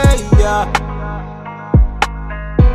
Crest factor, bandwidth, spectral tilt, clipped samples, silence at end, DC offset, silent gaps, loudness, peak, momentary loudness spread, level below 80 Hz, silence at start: 14 dB; 13.5 kHz; -6 dB/octave; under 0.1%; 0 s; under 0.1%; none; -16 LUFS; 0 dBFS; 14 LU; -16 dBFS; 0 s